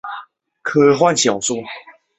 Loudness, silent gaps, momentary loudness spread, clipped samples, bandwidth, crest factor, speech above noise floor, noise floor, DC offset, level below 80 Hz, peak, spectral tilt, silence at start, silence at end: -16 LUFS; none; 20 LU; under 0.1%; 8.2 kHz; 16 dB; 24 dB; -39 dBFS; under 0.1%; -60 dBFS; -2 dBFS; -3.5 dB/octave; 0.05 s; 0.3 s